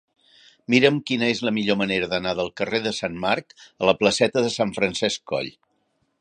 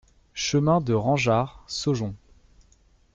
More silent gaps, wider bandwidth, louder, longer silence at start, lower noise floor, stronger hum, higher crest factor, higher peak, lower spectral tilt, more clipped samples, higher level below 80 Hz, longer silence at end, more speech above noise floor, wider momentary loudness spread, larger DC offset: neither; first, 10.5 kHz vs 7.8 kHz; about the same, -22 LUFS vs -24 LUFS; first, 0.7 s vs 0.35 s; first, -70 dBFS vs -59 dBFS; neither; about the same, 22 dB vs 18 dB; first, 0 dBFS vs -8 dBFS; about the same, -4.5 dB/octave vs -5.5 dB/octave; neither; second, -58 dBFS vs -52 dBFS; second, 0.7 s vs 1 s; first, 47 dB vs 36 dB; about the same, 8 LU vs 9 LU; neither